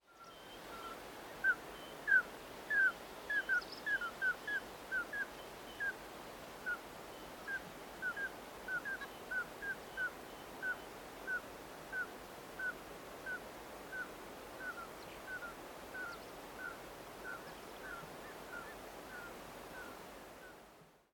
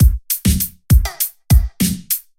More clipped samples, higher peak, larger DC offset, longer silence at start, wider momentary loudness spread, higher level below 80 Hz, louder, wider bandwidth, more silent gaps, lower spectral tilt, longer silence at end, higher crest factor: neither; second, -20 dBFS vs -2 dBFS; neither; about the same, 0.1 s vs 0 s; first, 15 LU vs 6 LU; second, -68 dBFS vs -18 dBFS; second, -42 LUFS vs -17 LUFS; about the same, 18 kHz vs 17 kHz; neither; second, -2.5 dB/octave vs -4.5 dB/octave; about the same, 0.15 s vs 0.2 s; first, 22 dB vs 14 dB